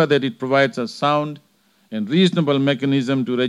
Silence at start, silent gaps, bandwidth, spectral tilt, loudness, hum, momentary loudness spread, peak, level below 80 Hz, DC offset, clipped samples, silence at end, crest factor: 0 s; none; 11.5 kHz; -6.5 dB/octave; -19 LUFS; none; 12 LU; -2 dBFS; -76 dBFS; under 0.1%; under 0.1%; 0 s; 16 dB